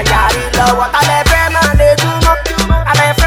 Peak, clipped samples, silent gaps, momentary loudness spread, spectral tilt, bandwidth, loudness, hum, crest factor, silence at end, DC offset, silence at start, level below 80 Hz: 0 dBFS; under 0.1%; none; 3 LU; -4 dB/octave; 17.5 kHz; -10 LUFS; none; 10 dB; 0 s; under 0.1%; 0 s; -18 dBFS